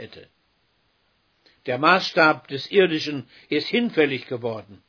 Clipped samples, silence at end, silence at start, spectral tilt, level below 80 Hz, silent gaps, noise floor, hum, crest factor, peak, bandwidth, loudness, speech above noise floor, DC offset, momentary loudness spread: under 0.1%; 0.15 s; 0 s; -5.5 dB/octave; -70 dBFS; none; -67 dBFS; none; 22 dB; -2 dBFS; 5.4 kHz; -21 LUFS; 45 dB; under 0.1%; 13 LU